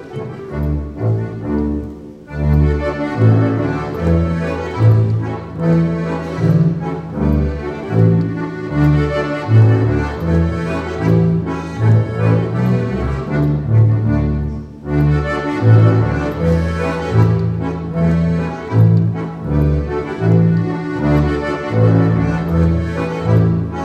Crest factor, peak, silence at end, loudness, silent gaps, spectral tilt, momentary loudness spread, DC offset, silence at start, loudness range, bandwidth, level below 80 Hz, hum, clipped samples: 14 dB; 0 dBFS; 0 s; -16 LUFS; none; -9.5 dB/octave; 9 LU; under 0.1%; 0 s; 2 LU; 6.8 kHz; -28 dBFS; none; under 0.1%